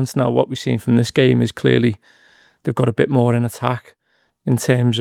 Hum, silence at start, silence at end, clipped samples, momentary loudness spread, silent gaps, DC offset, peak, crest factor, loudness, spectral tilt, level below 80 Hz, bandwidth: none; 0 s; 0 s; under 0.1%; 9 LU; none; under 0.1%; 0 dBFS; 18 dB; -18 LUFS; -6.5 dB/octave; -56 dBFS; 15 kHz